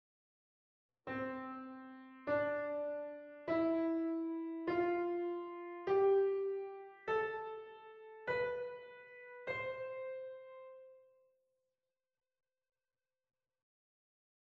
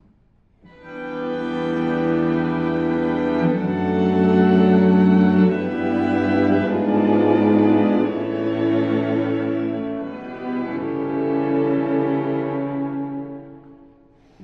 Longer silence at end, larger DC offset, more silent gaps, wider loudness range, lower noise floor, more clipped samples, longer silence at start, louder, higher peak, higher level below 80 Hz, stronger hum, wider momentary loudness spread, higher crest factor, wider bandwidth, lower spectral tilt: first, 3.5 s vs 0 s; neither; neither; first, 11 LU vs 6 LU; first, under -90 dBFS vs -57 dBFS; neither; first, 1.05 s vs 0.85 s; second, -39 LUFS vs -20 LUFS; second, -24 dBFS vs -4 dBFS; second, -78 dBFS vs -56 dBFS; neither; first, 19 LU vs 13 LU; about the same, 16 dB vs 16 dB; about the same, 5.8 kHz vs 5.6 kHz; second, -4.5 dB/octave vs -9.5 dB/octave